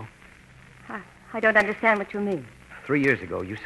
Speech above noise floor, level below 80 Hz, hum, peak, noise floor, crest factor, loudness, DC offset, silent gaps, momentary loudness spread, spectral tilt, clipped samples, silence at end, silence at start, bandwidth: 26 dB; -58 dBFS; none; -6 dBFS; -50 dBFS; 20 dB; -23 LUFS; under 0.1%; none; 20 LU; -6.5 dB/octave; under 0.1%; 0 s; 0 s; 12 kHz